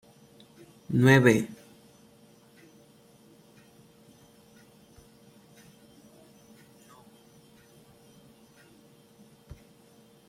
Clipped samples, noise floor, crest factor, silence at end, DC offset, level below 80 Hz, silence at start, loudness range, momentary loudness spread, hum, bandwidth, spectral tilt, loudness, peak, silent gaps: under 0.1%; -58 dBFS; 26 dB; 8.75 s; under 0.1%; -66 dBFS; 0.9 s; 28 LU; 33 LU; none; 16 kHz; -6.5 dB/octave; -22 LUFS; -6 dBFS; none